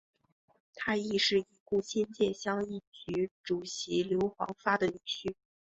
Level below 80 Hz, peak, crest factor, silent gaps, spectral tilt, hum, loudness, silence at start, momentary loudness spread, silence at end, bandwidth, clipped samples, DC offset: -66 dBFS; -14 dBFS; 20 dB; 1.60-1.66 s, 2.87-2.92 s, 3.31-3.44 s; -4 dB/octave; none; -33 LUFS; 0.75 s; 9 LU; 0.45 s; 8.2 kHz; under 0.1%; under 0.1%